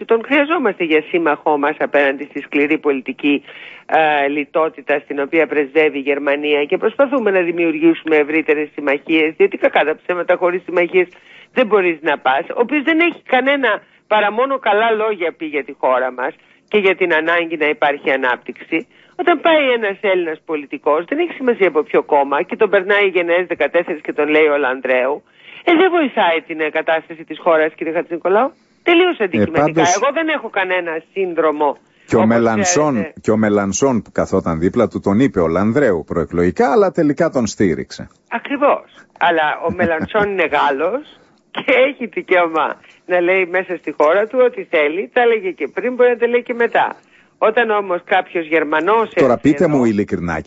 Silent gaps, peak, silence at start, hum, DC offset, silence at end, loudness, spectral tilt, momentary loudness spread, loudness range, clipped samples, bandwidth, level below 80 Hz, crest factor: none; -2 dBFS; 0 s; none; under 0.1%; 0.05 s; -16 LUFS; -4.5 dB/octave; 7 LU; 2 LU; under 0.1%; 8 kHz; -52 dBFS; 14 dB